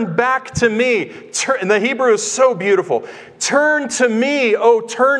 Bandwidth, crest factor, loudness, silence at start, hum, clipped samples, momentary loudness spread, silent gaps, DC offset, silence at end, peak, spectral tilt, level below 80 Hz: 11.5 kHz; 14 dB; -16 LUFS; 0 s; none; under 0.1%; 7 LU; none; under 0.1%; 0 s; 0 dBFS; -3.5 dB/octave; -54 dBFS